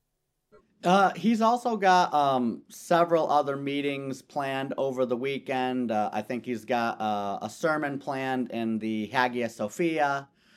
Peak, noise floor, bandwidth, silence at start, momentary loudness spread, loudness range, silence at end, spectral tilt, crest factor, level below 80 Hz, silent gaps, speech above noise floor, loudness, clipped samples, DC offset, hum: -6 dBFS; -79 dBFS; 14.5 kHz; 0.85 s; 10 LU; 5 LU; 0.3 s; -5.5 dB/octave; 20 dB; -76 dBFS; none; 52 dB; -27 LUFS; under 0.1%; under 0.1%; none